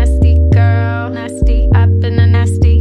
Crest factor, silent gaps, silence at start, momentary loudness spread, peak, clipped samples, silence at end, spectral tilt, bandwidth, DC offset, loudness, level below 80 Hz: 8 dB; none; 0 s; 7 LU; -2 dBFS; under 0.1%; 0 s; -8 dB/octave; 10.5 kHz; under 0.1%; -12 LUFS; -14 dBFS